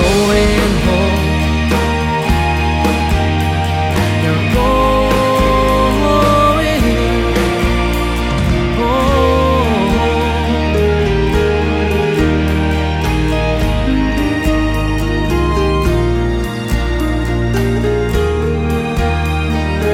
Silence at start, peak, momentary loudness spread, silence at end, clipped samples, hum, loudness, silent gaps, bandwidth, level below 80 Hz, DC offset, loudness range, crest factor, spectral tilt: 0 s; 0 dBFS; 4 LU; 0 s; under 0.1%; none; -14 LUFS; none; 16 kHz; -20 dBFS; under 0.1%; 3 LU; 12 dB; -6 dB/octave